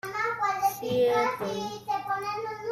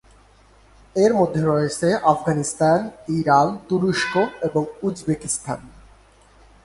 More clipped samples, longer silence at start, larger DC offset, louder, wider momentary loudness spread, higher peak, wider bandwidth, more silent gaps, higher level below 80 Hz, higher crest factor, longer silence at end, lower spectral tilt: neither; second, 0.05 s vs 0.95 s; neither; second, -28 LUFS vs -21 LUFS; about the same, 8 LU vs 9 LU; second, -14 dBFS vs -2 dBFS; first, 15.5 kHz vs 11.5 kHz; neither; second, -66 dBFS vs -52 dBFS; second, 14 dB vs 20 dB; second, 0 s vs 0.95 s; second, -4 dB/octave vs -5.5 dB/octave